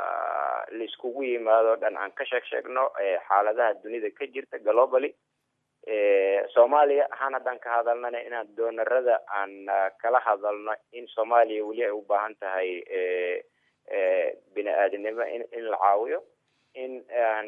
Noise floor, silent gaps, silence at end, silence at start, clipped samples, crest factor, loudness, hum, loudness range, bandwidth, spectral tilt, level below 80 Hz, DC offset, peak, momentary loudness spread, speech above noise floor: -78 dBFS; none; 0 s; 0 s; under 0.1%; 20 dB; -26 LUFS; none; 4 LU; 3.8 kHz; -5 dB/octave; under -90 dBFS; under 0.1%; -8 dBFS; 12 LU; 52 dB